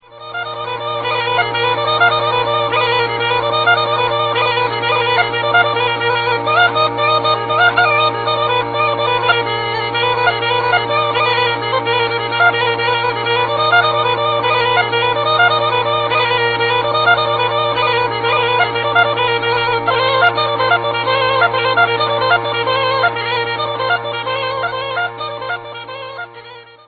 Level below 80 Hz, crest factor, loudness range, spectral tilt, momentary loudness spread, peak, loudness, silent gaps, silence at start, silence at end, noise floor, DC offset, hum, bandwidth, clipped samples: -50 dBFS; 16 dB; 2 LU; -6 dB/octave; 7 LU; 0 dBFS; -14 LUFS; none; 0.1 s; 0.25 s; -37 dBFS; under 0.1%; none; 4.9 kHz; under 0.1%